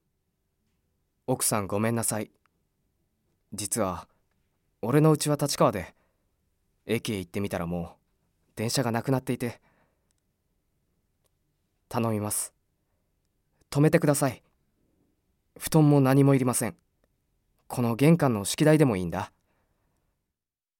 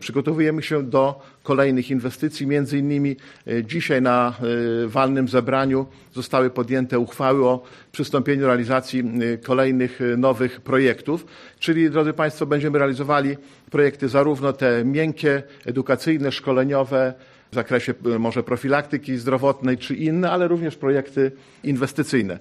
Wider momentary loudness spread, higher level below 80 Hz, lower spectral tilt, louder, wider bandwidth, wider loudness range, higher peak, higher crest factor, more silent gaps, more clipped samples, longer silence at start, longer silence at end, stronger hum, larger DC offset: first, 16 LU vs 7 LU; about the same, -60 dBFS vs -60 dBFS; second, -5.5 dB/octave vs -7 dB/octave; second, -26 LUFS vs -21 LUFS; first, 17 kHz vs 13.5 kHz; first, 10 LU vs 2 LU; about the same, -6 dBFS vs -4 dBFS; first, 22 dB vs 16 dB; neither; neither; first, 1.3 s vs 0 s; first, 1.5 s vs 0 s; neither; neither